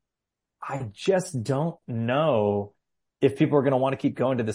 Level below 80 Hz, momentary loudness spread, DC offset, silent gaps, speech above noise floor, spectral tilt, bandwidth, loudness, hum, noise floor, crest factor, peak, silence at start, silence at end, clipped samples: -68 dBFS; 12 LU; under 0.1%; none; 62 dB; -7 dB/octave; 14.5 kHz; -25 LUFS; none; -86 dBFS; 18 dB; -8 dBFS; 0.6 s; 0 s; under 0.1%